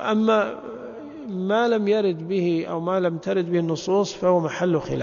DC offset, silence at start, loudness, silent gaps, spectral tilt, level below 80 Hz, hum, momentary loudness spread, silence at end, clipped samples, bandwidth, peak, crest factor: under 0.1%; 0 s; -23 LUFS; none; -6.5 dB/octave; -58 dBFS; none; 13 LU; 0 s; under 0.1%; 7.4 kHz; -8 dBFS; 14 dB